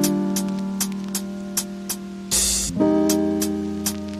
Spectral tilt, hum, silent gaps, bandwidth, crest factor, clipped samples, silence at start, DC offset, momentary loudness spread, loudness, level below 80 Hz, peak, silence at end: -3.5 dB/octave; none; none; 16 kHz; 16 dB; under 0.1%; 0 s; under 0.1%; 10 LU; -22 LUFS; -44 dBFS; -6 dBFS; 0 s